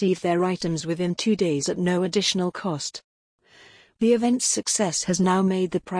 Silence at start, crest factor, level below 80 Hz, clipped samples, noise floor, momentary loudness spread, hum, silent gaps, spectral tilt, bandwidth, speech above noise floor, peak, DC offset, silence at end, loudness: 0 s; 16 dB; -60 dBFS; under 0.1%; -52 dBFS; 7 LU; none; 3.04-3.38 s; -4.5 dB/octave; 10.5 kHz; 29 dB; -8 dBFS; under 0.1%; 0 s; -23 LUFS